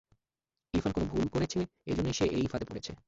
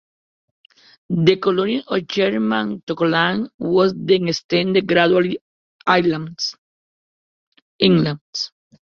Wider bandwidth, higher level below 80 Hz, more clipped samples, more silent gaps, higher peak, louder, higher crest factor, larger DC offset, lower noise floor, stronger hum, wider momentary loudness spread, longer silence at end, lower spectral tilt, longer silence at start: first, 8 kHz vs 7 kHz; first, -48 dBFS vs -58 dBFS; neither; second, none vs 2.83-2.87 s, 3.54-3.59 s, 4.44-4.49 s, 5.41-5.79 s, 6.58-7.52 s, 7.62-7.79 s, 8.21-8.33 s; second, -16 dBFS vs 0 dBFS; second, -33 LUFS vs -19 LUFS; about the same, 16 dB vs 18 dB; neither; about the same, under -90 dBFS vs under -90 dBFS; neither; second, 6 LU vs 10 LU; second, 0.1 s vs 0.35 s; about the same, -6 dB/octave vs -5.5 dB/octave; second, 0.75 s vs 1.1 s